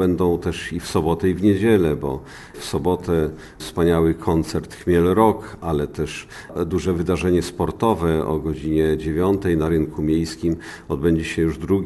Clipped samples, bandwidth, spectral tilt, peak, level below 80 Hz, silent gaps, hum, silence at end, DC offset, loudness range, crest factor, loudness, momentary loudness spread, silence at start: under 0.1%; 12 kHz; -7 dB/octave; -2 dBFS; -40 dBFS; none; none; 0 s; under 0.1%; 2 LU; 18 dB; -21 LUFS; 10 LU; 0 s